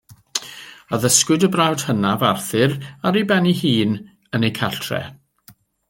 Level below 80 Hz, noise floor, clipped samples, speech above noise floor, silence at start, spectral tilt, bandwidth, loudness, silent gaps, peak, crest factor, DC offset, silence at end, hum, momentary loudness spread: -58 dBFS; -51 dBFS; under 0.1%; 33 dB; 0.1 s; -4 dB/octave; 17 kHz; -19 LUFS; none; 0 dBFS; 20 dB; under 0.1%; 0.4 s; none; 12 LU